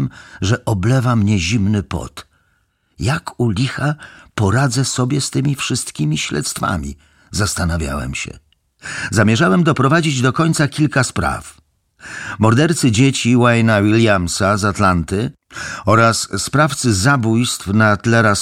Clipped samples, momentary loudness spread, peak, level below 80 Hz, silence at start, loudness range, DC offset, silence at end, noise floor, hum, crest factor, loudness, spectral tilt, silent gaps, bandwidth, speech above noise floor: under 0.1%; 13 LU; 0 dBFS; -38 dBFS; 0 s; 6 LU; under 0.1%; 0 s; -62 dBFS; none; 16 dB; -16 LUFS; -5 dB/octave; none; 15.5 kHz; 47 dB